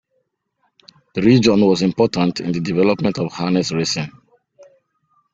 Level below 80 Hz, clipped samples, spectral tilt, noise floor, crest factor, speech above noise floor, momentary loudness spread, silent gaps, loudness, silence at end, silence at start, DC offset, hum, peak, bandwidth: -52 dBFS; under 0.1%; -6 dB/octave; -69 dBFS; 18 dB; 52 dB; 9 LU; none; -17 LUFS; 1.25 s; 1.15 s; under 0.1%; none; -2 dBFS; 7.8 kHz